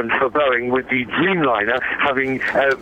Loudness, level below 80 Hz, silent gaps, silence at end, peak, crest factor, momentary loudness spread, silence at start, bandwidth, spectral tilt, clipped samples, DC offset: -18 LUFS; -50 dBFS; none; 0 s; -4 dBFS; 14 dB; 3 LU; 0 s; 9 kHz; -6.5 dB/octave; under 0.1%; under 0.1%